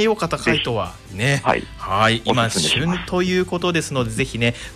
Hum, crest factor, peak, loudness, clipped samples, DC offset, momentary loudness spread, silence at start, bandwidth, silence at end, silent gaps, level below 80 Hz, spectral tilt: none; 16 dB; -4 dBFS; -20 LUFS; under 0.1%; under 0.1%; 6 LU; 0 s; 15 kHz; 0 s; none; -42 dBFS; -4.5 dB/octave